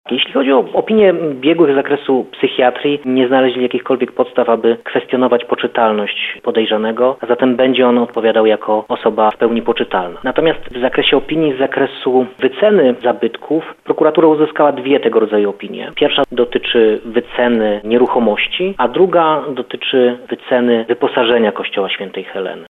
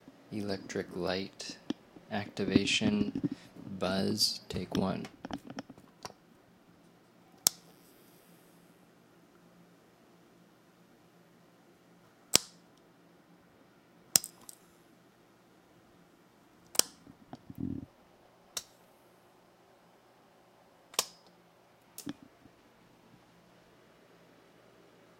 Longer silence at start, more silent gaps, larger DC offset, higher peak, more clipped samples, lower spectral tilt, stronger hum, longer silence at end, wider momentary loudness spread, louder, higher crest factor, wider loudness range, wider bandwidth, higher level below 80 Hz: about the same, 0.05 s vs 0.05 s; neither; neither; about the same, 0 dBFS vs 0 dBFS; neither; first, -7.5 dB/octave vs -3 dB/octave; neither; second, 0.05 s vs 3.1 s; second, 7 LU vs 23 LU; first, -14 LUFS vs -33 LUFS; second, 14 dB vs 40 dB; second, 2 LU vs 14 LU; second, 4.1 kHz vs 16 kHz; first, -48 dBFS vs -66 dBFS